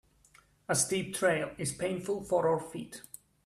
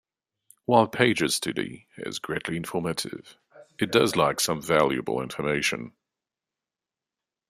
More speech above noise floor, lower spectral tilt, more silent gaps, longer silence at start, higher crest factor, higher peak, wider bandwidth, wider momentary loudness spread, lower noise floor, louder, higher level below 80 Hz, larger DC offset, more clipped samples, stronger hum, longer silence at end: second, 32 dB vs 64 dB; about the same, -3.5 dB/octave vs -4 dB/octave; neither; about the same, 0.7 s vs 0.7 s; about the same, 20 dB vs 24 dB; second, -14 dBFS vs -2 dBFS; about the same, 15.5 kHz vs 15.5 kHz; first, 17 LU vs 14 LU; second, -63 dBFS vs -90 dBFS; second, -31 LUFS vs -25 LUFS; about the same, -66 dBFS vs -62 dBFS; neither; neither; neither; second, 0.45 s vs 1.6 s